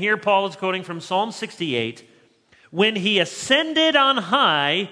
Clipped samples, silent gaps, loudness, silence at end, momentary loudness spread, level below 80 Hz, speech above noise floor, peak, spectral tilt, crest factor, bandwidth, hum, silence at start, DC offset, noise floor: under 0.1%; none; -20 LUFS; 0 s; 11 LU; -70 dBFS; 35 dB; -2 dBFS; -3.5 dB/octave; 20 dB; 11 kHz; none; 0 s; under 0.1%; -56 dBFS